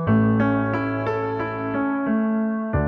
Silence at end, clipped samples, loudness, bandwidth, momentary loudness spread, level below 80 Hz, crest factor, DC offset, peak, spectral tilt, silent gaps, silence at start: 0 s; under 0.1%; -22 LUFS; 5.4 kHz; 6 LU; -42 dBFS; 14 dB; under 0.1%; -8 dBFS; -10.5 dB/octave; none; 0 s